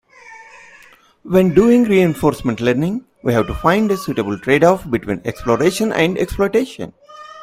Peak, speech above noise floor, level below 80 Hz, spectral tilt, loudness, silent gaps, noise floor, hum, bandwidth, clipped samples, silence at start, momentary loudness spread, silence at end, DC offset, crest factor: 0 dBFS; 32 dB; -40 dBFS; -6.5 dB/octave; -16 LUFS; none; -47 dBFS; none; 16 kHz; under 0.1%; 0.25 s; 10 LU; 0 s; under 0.1%; 16 dB